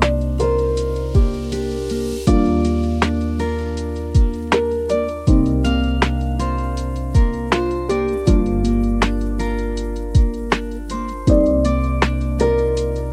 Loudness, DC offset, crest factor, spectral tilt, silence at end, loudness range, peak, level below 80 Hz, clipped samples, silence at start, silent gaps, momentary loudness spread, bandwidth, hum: -19 LUFS; under 0.1%; 16 dB; -7 dB/octave; 0 s; 1 LU; -2 dBFS; -22 dBFS; under 0.1%; 0 s; none; 7 LU; 12 kHz; none